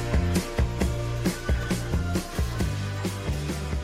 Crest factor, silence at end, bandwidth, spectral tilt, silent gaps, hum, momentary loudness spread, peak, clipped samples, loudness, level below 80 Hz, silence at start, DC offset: 14 dB; 0 s; 16 kHz; -5.5 dB/octave; none; none; 4 LU; -12 dBFS; under 0.1%; -28 LUFS; -30 dBFS; 0 s; under 0.1%